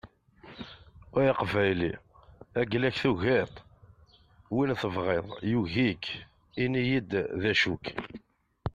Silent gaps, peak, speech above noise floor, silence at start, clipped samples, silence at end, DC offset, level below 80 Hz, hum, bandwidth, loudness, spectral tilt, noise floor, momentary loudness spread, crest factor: none; -12 dBFS; 31 dB; 0.05 s; under 0.1%; 0.05 s; under 0.1%; -56 dBFS; none; 10 kHz; -29 LUFS; -6.5 dB/octave; -59 dBFS; 17 LU; 18 dB